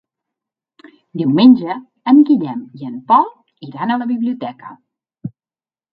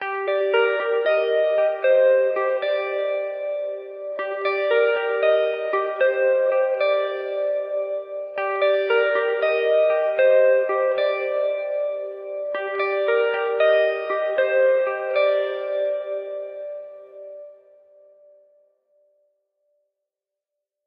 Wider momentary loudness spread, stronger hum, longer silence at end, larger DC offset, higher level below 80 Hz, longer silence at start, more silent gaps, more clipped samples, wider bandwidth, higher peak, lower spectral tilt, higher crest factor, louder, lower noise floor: first, 22 LU vs 12 LU; neither; second, 0.65 s vs 3.35 s; neither; first, -64 dBFS vs -84 dBFS; first, 1.15 s vs 0 s; neither; neither; about the same, 5 kHz vs 5.2 kHz; first, 0 dBFS vs -6 dBFS; first, -10 dB/octave vs -4.5 dB/octave; about the same, 16 dB vs 16 dB; first, -15 LUFS vs -21 LUFS; first, under -90 dBFS vs -86 dBFS